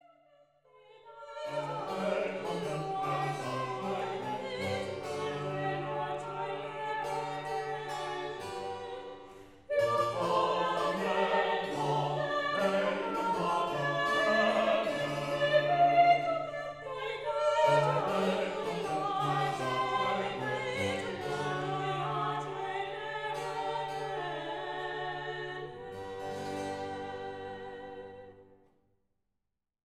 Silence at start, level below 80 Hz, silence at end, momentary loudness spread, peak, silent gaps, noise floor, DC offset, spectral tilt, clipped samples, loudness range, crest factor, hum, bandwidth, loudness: 0.9 s; -68 dBFS; 1.5 s; 12 LU; -14 dBFS; none; -87 dBFS; under 0.1%; -5 dB/octave; under 0.1%; 10 LU; 18 dB; none; 14.5 kHz; -32 LUFS